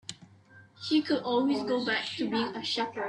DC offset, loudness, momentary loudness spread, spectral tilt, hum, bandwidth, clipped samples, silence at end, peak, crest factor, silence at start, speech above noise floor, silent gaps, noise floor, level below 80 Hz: under 0.1%; -29 LUFS; 4 LU; -4 dB/octave; none; 11 kHz; under 0.1%; 0 s; -16 dBFS; 16 dB; 0.1 s; 27 dB; none; -56 dBFS; -74 dBFS